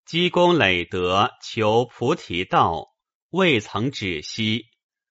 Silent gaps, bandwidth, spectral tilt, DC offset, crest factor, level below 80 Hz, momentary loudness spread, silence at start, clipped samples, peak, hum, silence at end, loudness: 3.15-3.29 s; 8 kHz; -3 dB/octave; under 0.1%; 20 dB; -54 dBFS; 9 LU; 0.1 s; under 0.1%; -2 dBFS; none; 0.5 s; -21 LUFS